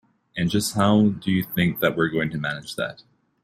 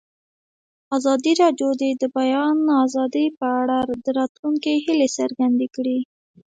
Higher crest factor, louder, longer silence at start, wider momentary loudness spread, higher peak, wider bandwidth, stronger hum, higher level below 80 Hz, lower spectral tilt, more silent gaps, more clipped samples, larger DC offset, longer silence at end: about the same, 18 dB vs 16 dB; second, -23 LUFS vs -20 LUFS; second, 0.35 s vs 0.9 s; first, 11 LU vs 6 LU; about the same, -6 dBFS vs -4 dBFS; first, 16 kHz vs 9.2 kHz; neither; first, -56 dBFS vs -66 dBFS; first, -5.5 dB/octave vs -3.5 dB/octave; second, none vs 3.37-3.41 s, 4.29-4.43 s; neither; neither; about the same, 0.5 s vs 0.4 s